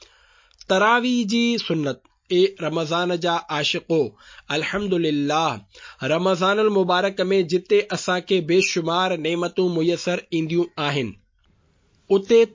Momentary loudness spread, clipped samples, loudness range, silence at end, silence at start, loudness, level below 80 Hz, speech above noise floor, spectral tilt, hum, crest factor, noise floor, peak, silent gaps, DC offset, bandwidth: 7 LU; under 0.1%; 3 LU; 0.05 s; 0.7 s; -21 LUFS; -60 dBFS; 41 dB; -5 dB/octave; none; 16 dB; -61 dBFS; -4 dBFS; none; under 0.1%; 7.6 kHz